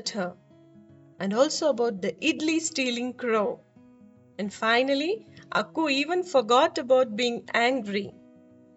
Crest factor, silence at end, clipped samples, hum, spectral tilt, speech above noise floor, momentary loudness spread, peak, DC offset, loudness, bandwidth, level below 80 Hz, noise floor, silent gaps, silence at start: 18 dB; 0.65 s; under 0.1%; none; -3.5 dB/octave; 29 dB; 12 LU; -8 dBFS; under 0.1%; -26 LUFS; 8.2 kHz; -74 dBFS; -54 dBFS; none; 0 s